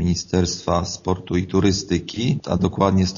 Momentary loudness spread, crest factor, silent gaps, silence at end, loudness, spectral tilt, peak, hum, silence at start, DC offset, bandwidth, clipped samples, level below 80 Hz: 5 LU; 18 dB; none; 0 s; -21 LUFS; -6 dB/octave; -2 dBFS; none; 0 s; under 0.1%; 7.4 kHz; under 0.1%; -40 dBFS